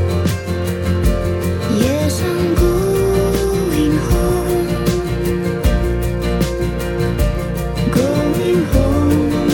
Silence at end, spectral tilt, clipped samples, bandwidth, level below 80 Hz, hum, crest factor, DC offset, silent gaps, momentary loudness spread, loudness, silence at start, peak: 0 s; -6.5 dB/octave; under 0.1%; 17.5 kHz; -22 dBFS; none; 12 dB; under 0.1%; none; 4 LU; -17 LUFS; 0 s; -2 dBFS